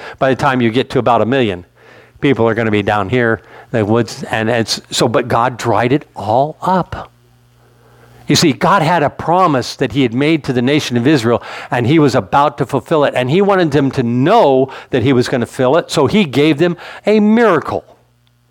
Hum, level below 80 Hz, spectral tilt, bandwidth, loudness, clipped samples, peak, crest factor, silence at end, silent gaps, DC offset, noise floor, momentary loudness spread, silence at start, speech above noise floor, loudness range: none; -46 dBFS; -5.5 dB/octave; 18 kHz; -14 LUFS; under 0.1%; 0 dBFS; 12 dB; 0.7 s; none; under 0.1%; -54 dBFS; 7 LU; 0 s; 41 dB; 3 LU